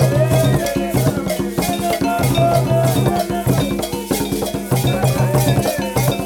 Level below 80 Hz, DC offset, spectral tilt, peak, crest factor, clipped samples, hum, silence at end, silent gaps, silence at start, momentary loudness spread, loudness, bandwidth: -36 dBFS; under 0.1%; -6 dB/octave; -2 dBFS; 14 dB; under 0.1%; none; 0 s; none; 0 s; 6 LU; -17 LUFS; 19 kHz